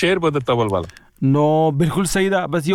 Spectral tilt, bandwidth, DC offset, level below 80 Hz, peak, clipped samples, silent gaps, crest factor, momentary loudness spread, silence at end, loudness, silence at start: -6 dB/octave; 16.5 kHz; under 0.1%; -44 dBFS; -4 dBFS; under 0.1%; none; 14 dB; 7 LU; 0 s; -18 LUFS; 0 s